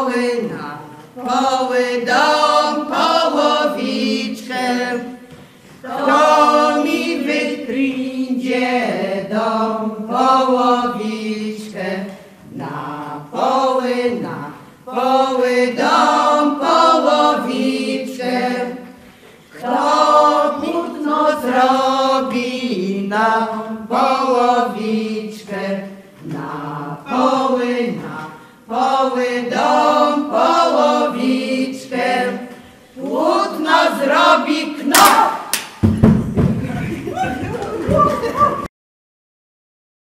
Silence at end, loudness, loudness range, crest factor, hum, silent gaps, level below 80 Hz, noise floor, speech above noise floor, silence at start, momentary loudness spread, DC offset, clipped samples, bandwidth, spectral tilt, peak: 1.35 s; -16 LUFS; 6 LU; 16 dB; none; none; -44 dBFS; -43 dBFS; 26 dB; 0 s; 14 LU; under 0.1%; under 0.1%; 15.5 kHz; -4.5 dB/octave; 0 dBFS